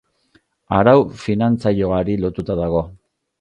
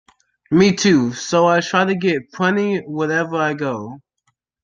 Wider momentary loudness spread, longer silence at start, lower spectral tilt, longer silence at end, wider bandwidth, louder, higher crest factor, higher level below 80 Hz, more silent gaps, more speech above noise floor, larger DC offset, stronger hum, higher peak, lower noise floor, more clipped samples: about the same, 9 LU vs 8 LU; first, 0.7 s vs 0.5 s; first, -8.5 dB/octave vs -5 dB/octave; second, 0.45 s vs 0.65 s; about the same, 9.8 kHz vs 9 kHz; about the same, -18 LUFS vs -17 LUFS; about the same, 18 dB vs 16 dB; first, -40 dBFS vs -58 dBFS; neither; second, 43 dB vs 52 dB; neither; neither; about the same, 0 dBFS vs -2 dBFS; second, -59 dBFS vs -69 dBFS; neither